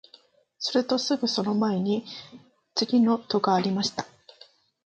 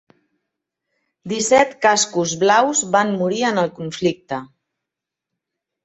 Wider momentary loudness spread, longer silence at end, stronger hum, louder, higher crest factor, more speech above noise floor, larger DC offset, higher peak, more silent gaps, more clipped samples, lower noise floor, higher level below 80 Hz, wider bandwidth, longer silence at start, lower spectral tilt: about the same, 12 LU vs 12 LU; second, 0.8 s vs 1.4 s; neither; second, -25 LUFS vs -18 LUFS; about the same, 18 dB vs 20 dB; second, 33 dB vs 66 dB; neither; second, -10 dBFS vs -2 dBFS; neither; neither; second, -58 dBFS vs -84 dBFS; second, -72 dBFS vs -62 dBFS; about the same, 8.6 kHz vs 8.4 kHz; second, 0.6 s vs 1.25 s; first, -5 dB/octave vs -3 dB/octave